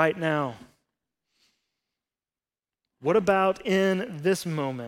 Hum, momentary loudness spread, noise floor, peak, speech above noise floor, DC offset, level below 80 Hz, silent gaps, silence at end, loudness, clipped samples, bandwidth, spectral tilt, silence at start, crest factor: none; 7 LU; under -90 dBFS; -6 dBFS; over 65 dB; under 0.1%; -66 dBFS; none; 0 s; -25 LUFS; under 0.1%; 16.5 kHz; -5.5 dB/octave; 0 s; 20 dB